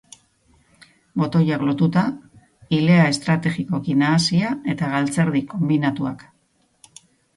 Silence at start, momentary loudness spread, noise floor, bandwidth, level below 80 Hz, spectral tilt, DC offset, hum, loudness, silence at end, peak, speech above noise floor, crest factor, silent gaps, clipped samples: 1.15 s; 10 LU; -64 dBFS; 11.5 kHz; -58 dBFS; -6 dB/octave; under 0.1%; none; -20 LUFS; 1.2 s; -4 dBFS; 45 dB; 18 dB; none; under 0.1%